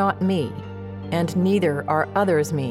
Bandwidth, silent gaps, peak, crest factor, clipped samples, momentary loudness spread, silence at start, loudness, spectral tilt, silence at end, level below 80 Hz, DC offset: 15 kHz; none; -8 dBFS; 14 dB; under 0.1%; 13 LU; 0 s; -22 LUFS; -7 dB/octave; 0 s; -58 dBFS; under 0.1%